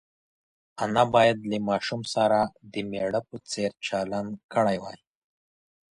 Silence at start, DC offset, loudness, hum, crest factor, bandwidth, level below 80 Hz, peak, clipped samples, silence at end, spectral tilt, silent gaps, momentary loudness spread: 0.75 s; under 0.1%; -26 LUFS; none; 20 dB; 11.5 kHz; -62 dBFS; -6 dBFS; under 0.1%; 1 s; -5 dB/octave; 4.44-4.49 s; 12 LU